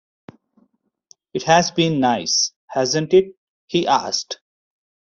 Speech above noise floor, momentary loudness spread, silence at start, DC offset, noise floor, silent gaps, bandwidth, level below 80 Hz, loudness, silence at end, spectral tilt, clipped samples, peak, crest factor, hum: 46 dB; 14 LU; 1.35 s; under 0.1%; -64 dBFS; 2.56-2.68 s, 3.37-3.68 s; 7.4 kHz; -60 dBFS; -18 LUFS; 0.8 s; -3.5 dB/octave; under 0.1%; -2 dBFS; 20 dB; none